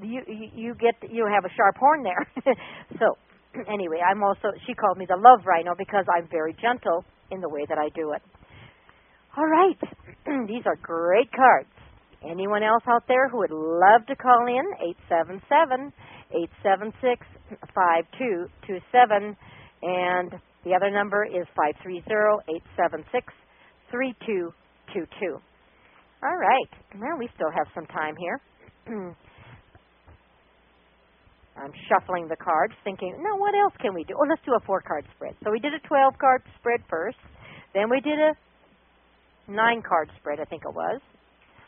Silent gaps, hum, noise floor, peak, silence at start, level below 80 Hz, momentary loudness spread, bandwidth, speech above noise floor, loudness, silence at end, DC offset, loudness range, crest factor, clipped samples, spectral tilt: none; none; -60 dBFS; 0 dBFS; 0 s; -64 dBFS; 16 LU; 3.7 kHz; 37 dB; -24 LUFS; 0.7 s; under 0.1%; 9 LU; 24 dB; under 0.1%; 1 dB/octave